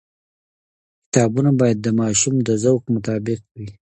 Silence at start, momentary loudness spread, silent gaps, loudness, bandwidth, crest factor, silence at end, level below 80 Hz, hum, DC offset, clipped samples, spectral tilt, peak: 1.15 s; 11 LU; 3.51-3.55 s; -19 LUFS; 9.6 kHz; 20 dB; 0.25 s; -54 dBFS; none; under 0.1%; under 0.1%; -5.5 dB/octave; 0 dBFS